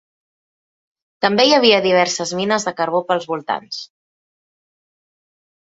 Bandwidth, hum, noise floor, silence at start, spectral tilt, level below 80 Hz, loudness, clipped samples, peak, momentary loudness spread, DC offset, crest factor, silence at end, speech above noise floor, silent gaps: 8 kHz; none; under -90 dBFS; 1.2 s; -3 dB/octave; -66 dBFS; -16 LUFS; under 0.1%; 0 dBFS; 12 LU; under 0.1%; 20 dB; 1.8 s; over 73 dB; none